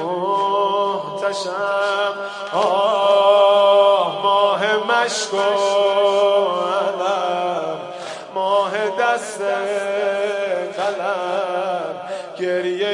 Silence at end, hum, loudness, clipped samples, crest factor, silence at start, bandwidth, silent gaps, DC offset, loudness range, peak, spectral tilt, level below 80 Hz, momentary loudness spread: 0 s; none; -18 LUFS; under 0.1%; 16 dB; 0 s; 11.5 kHz; none; under 0.1%; 6 LU; -2 dBFS; -3 dB/octave; -76 dBFS; 10 LU